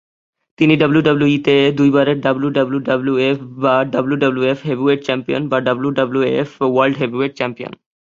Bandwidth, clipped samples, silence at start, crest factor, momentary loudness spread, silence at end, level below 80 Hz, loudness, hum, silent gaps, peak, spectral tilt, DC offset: 7.4 kHz; under 0.1%; 0.6 s; 16 dB; 6 LU; 0.35 s; -56 dBFS; -16 LUFS; none; none; 0 dBFS; -7.5 dB/octave; under 0.1%